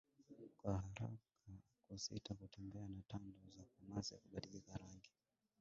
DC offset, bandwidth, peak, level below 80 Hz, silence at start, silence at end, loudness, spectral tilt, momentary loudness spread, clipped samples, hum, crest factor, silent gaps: under 0.1%; 7.4 kHz; -30 dBFS; -66 dBFS; 0.2 s; 0.55 s; -52 LUFS; -6 dB/octave; 17 LU; under 0.1%; none; 22 dB; none